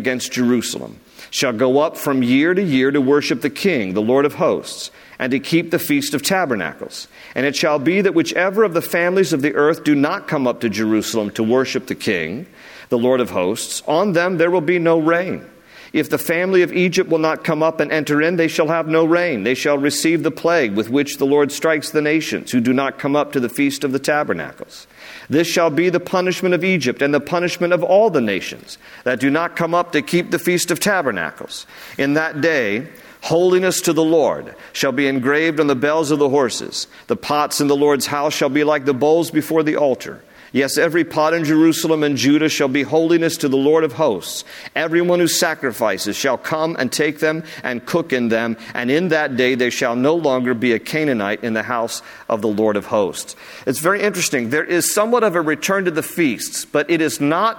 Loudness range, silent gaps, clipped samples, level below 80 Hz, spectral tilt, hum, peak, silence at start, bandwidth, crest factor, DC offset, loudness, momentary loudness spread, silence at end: 3 LU; none; under 0.1%; -60 dBFS; -4.5 dB/octave; none; -4 dBFS; 0 s; 19 kHz; 14 dB; under 0.1%; -17 LUFS; 9 LU; 0 s